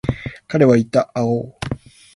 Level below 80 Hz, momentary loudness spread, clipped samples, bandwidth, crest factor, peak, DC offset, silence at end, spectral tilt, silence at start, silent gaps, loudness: -42 dBFS; 15 LU; under 0.1%; 11.5 kHz; 16 dB; -2 dBFS; under 0.1%; 0.4 s; -7.5 dB/octave; 0.05 s; none; -18 LUFS